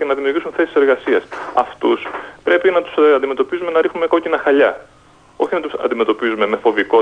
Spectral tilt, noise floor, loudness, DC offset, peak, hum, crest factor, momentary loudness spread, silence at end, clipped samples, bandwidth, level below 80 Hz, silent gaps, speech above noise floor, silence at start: -5.5 dB/octave; -47 dBFS; -16 LUFS; under 0.1%; -2 dBFS; none; 14 dB; 7 LU; 0 s; under 0.1%; 8.8 kHz; -56 dBFS; none; 31 dB; 0 s